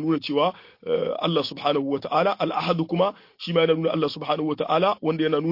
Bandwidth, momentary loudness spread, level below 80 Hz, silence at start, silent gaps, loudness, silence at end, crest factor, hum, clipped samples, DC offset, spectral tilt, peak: 5.8 kHz; 4 LU; -68 dBFS; 0 s; none; -24 LUFS; 0 s; 16 dB; none; under 0.1%; under 0.1%; -7.5 dB/octave; -8 dBFS